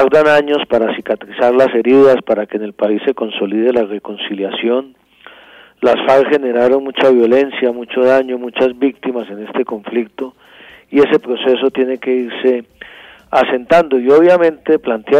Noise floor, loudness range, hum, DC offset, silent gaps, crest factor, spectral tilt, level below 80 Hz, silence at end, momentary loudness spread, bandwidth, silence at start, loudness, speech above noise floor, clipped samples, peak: -42 dBFS; 5 LU; none; under 0.1%; none; 12 dB; -6 dB/octave; -56 dBFS; 0 s; 11 LU; 8.8 kHz; 0 s; -14 LUFS; 29 dB; under 0.1%; -2 dBFS